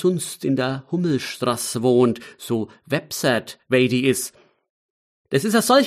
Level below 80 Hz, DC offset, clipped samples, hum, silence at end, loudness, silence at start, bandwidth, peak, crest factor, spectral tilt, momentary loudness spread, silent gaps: -64 dBFS; under 0.1%; under 0.1%; none; 0 s; -22 LUFS; 0 s; 15.5 kHz; -4 dBFS; 16 dB; -4.5 dB/octave; 9 LU; 4.70-5.25 s